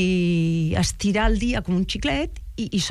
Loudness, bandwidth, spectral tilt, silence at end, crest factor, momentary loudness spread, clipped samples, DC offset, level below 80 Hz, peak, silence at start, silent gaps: -23 LUFS; 13 kHz; -5 dB/octave; 0 s; 14 dB; 6 LU; under 0.1%; under 0.1%; -30 dBFS; -8 dBFS; 0 s; none